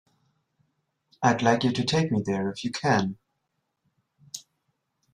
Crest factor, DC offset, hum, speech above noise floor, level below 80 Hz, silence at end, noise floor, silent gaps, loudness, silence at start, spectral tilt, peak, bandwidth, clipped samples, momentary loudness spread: 22 dB; under 0.1%; none; 54 dB; -64 dBFS; 0.75 s; -78 dBFS; none; -25 LUFS; 1.2 s; -5.5 dB/octave; -6 dBFS; 14 kHz; under 0.1%; 19 LU